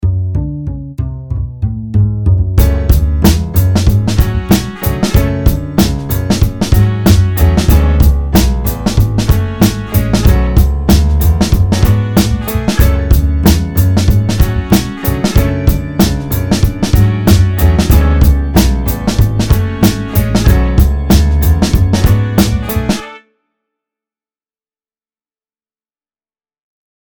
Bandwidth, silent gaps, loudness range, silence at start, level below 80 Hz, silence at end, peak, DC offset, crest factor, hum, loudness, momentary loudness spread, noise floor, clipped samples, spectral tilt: over 20 kHz; none; 3 LU; 0 s; -14 dBFS; 3.85 s; 0 dBFS; under 0.1%; 10 dB; none; -12 LUFS; 6 LU; under -90 dBFS; 0.8%; -6 dB/octave